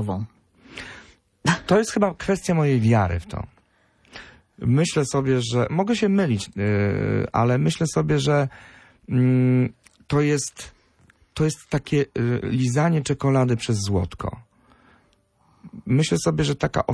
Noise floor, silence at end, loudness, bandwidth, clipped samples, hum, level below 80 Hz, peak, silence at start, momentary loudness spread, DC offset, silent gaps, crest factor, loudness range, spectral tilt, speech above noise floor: -62 dBFS; 0 s; -22 LUFS; 11 kHz; under 0.1%; none; -46 dBFS; -6 dBFS; 0 s; 16 LU; under 0.1%; none; 16 dB; 3 LU; -6 dB/octave; 41 dB